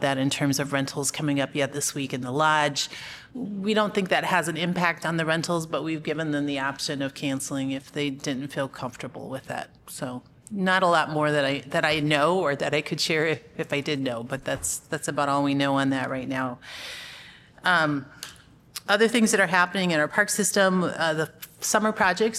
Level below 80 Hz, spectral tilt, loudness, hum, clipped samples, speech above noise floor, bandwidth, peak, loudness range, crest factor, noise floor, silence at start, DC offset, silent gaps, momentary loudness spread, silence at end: -62 dBFS; -4 dB/octave; -25 LUFS; none; under 0.1%; 24 dB; 15.5 kHz; -6 dBFS; 6 LU; 20 dB; -49 dBFS; 0 s; under 0.1%; none; 14 LU; 0 s